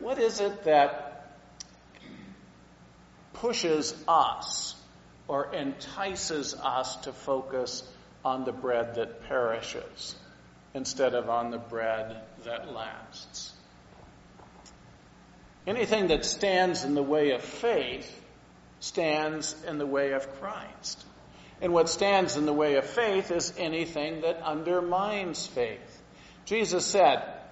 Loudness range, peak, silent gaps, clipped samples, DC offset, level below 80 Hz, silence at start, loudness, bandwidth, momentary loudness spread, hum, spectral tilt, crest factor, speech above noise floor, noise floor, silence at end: 6 LU; -8 dBFS; none; under 0.1%; under 0.1%; -58 dBFS; 0 s; -29 LUFS; 8 kHz; 17 LU; 60 Hz at -60 dBFS; -2.5 dB/octave; 22 dB; 26 dB; -55 dBFS; 0 s